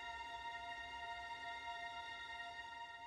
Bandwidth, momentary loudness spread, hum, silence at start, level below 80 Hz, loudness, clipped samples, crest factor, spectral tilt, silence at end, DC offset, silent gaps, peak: 14.5 kHz; 2 LU; none; 0 s; -70 dBFS; -48 LUFS; under 0.1%; 12 dB; -2 dB/octave; 0 s; under 0.1%; none; -38 dBFS